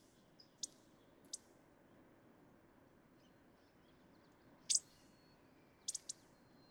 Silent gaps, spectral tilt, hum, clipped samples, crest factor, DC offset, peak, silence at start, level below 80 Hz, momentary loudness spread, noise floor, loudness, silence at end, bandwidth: none; 0.5 dB/octave; none; under 0.1%; 32 dB; under 0.1%; -20 dBFS; 0.65 s; -82 dBFS; 31 LU; -69 dBFS; -43 LUFS; 0.6 s; over 20 kHz